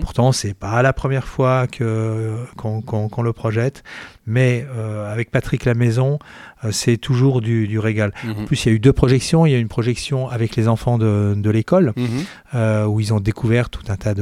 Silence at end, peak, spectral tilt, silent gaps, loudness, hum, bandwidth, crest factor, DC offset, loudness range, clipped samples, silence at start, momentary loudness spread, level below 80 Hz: 0 s; 0 dBFS; -6.5 dB/octave; none; -19 LUFS; none; 12.5 kHz; 18 dB; under 0.1%; 4 LU; under 0.1%; 0 s; 10 LU; -38 dBFS